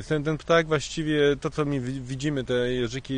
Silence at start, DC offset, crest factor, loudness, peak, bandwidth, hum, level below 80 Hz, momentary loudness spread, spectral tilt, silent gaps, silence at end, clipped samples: 0 s; under 0.1%; 16 dB; -26 LUFS; -8 dBFS; 10 kHz; none; -48 dBFS; 7 LU; -5.5 dB/octave; none; 0 s; under 0.1%